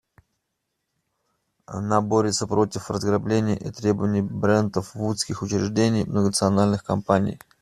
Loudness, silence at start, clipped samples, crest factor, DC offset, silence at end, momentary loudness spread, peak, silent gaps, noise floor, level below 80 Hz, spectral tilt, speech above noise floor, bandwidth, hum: -23 LUFS; 1.7 s; under 0.1%; 20 dB; under 0.1%; 0.25 s; 6 LU; -4 dBFS; none; -78 dBFS; -56 dBFS; -5.5 dB/octave; 56 dB; 13.5 kHz; none